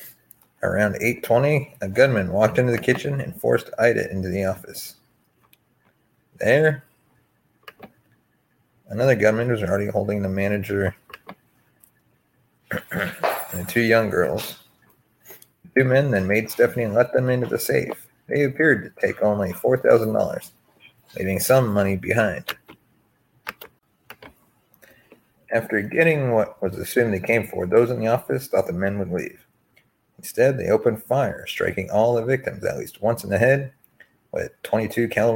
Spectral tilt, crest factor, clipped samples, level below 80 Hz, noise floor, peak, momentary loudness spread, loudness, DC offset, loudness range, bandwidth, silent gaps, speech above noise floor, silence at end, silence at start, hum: -6 dB/octave; 20 dB; under 0.1%; -56 dBFS; -65 dBFS; -2 dBFS; 13 LU; -22 LUFS; under 0.1%; 5 LU; 17 kHz; none; 45 dB; 0 s; 0 s; none